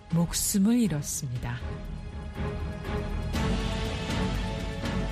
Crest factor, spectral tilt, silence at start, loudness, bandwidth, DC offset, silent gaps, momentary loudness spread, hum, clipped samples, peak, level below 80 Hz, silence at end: 14 dB; -5 dB/octave; 0 s; -30 LUFS; 15.5 kHz; under 0.1%; none; 12 LU; none; under 0.1%; -14 dBFS; -36 dBFS; 0 s